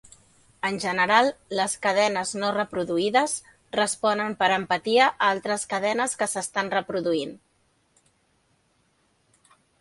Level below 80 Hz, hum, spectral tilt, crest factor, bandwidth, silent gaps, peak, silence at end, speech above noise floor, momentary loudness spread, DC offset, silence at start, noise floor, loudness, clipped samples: -66 dBFS; none; -2.5 dB/octave; 22 dB; 11.5 kHz; none; -4 dBFS; 2.45 s; 43 dB; 8 LU; under 0.1%; 0.65 s; -67 dBFS; -24 LUFS; under 0.1%